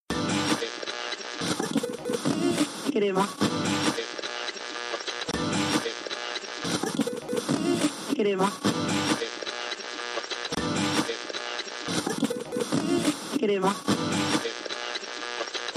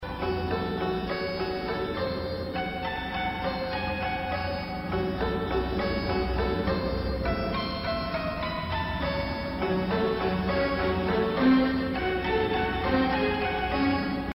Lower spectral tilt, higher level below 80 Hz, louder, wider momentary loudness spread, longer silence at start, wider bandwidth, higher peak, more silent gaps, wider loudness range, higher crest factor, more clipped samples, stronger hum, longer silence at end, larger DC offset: second, -4 dB/octave vs -8 dB/octave; second, -60 dBFS vs -40 dBFS; about the same, -28 LUFS vs -28 LUFS; about the same, 7 LU vs 5 LU; about the same, 0.1 s vs 0 s; about the same, 15.5 kHz vs 16 kHz; about the same, -12 dBFS vs -12 dBFS; neither; second, 2 LU vs 5 LU; about the same, 16 dB vs 16 dB; neither; neither; about the same, 0 s vs 0.05 s; neither